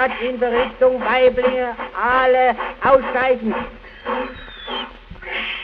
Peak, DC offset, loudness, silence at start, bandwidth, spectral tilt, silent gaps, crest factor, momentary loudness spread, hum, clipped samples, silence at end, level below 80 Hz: 0 dBFS; under 0.1%; -18 LUFS; 0 s; 5 kHz; -6.5 dB/octave; none; 18 dB; 15 LU; none; under 0.1%; 0 s; -44 dBFS